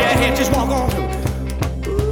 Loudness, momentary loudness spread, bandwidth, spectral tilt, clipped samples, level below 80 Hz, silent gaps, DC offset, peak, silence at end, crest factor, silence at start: -19 LUFS; 8 LU; 19 kHz; -5 dB/octave; under 0.1%; -24 dBFS; none; under 0.1%; -2 dBFS; 0 s; 16 dB; 0 s